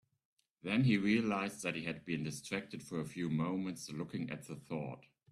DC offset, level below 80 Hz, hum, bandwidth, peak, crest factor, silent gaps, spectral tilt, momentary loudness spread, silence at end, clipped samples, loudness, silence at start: under 0.1%; -72 dBFS; none; 13.5 kHz; -20 dBFS; 18 dB; none; -6 dB/octave; 12 LU; 0.3 s; under 0.1%; -38 LUFS; 0.65 s